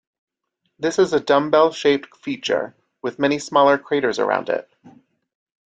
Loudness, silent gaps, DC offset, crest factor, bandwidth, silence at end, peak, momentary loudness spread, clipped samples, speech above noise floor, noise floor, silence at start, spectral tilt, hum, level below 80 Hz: -20 LUFS; none; under 0.1%; 18 dB; 9.4 kHz; 0.8 s; -2 dBFS; 11 LU; under 0.1%; 55 dB; -74 dBFS; 0.8 s; -4.5 dB/octave; none; -64 dBFS